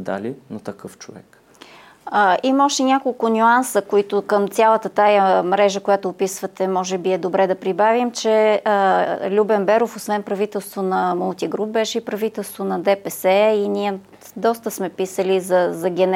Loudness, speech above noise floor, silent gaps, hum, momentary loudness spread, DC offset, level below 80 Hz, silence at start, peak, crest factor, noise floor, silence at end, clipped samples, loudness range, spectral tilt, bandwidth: -19 LUFS; 26 dB; none; none; 10 LU; under 0.1%; -72 dBFS; 0 s; -4 dBFS; 14 dB; -45 dBFS; 0 s; under 0.1%; 4 LU; -4.5 dB/octave; 17 kHz